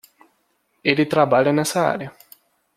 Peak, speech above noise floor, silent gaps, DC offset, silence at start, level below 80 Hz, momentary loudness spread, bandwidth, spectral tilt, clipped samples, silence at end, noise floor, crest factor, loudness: -2 dBFS; 49 dB; none; under 0.1%; 0.85 s; -64 dBFS; 10 LU; 16 kHz; -5 dB/octave; under 0.1%; 0.65 s; -67 dBFS; 20 dB; -19 LUFS